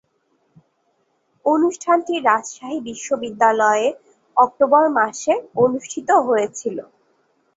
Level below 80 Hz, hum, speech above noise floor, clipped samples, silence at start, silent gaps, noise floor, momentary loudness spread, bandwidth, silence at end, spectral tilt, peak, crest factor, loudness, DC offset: -68 dBFS; none; 48 dB; under 0.1%; 1.45 s; none; -66 dBFS; 13 LU; 8 kHz; 0.75 s; -4 dB/octave; -2 dBFS; 18 dB; -19 LUFS; under 0.1%